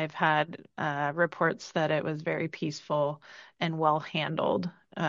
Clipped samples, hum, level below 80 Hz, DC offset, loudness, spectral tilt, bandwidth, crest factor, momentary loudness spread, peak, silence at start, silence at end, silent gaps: under 0.1%; none; -72 dBFS; under 0.1%; -30 LUFS; -6 dB/octave; 7.6 kHz; 20 dB; 8 LU; -10 dBFS; 0 s; 0 s; none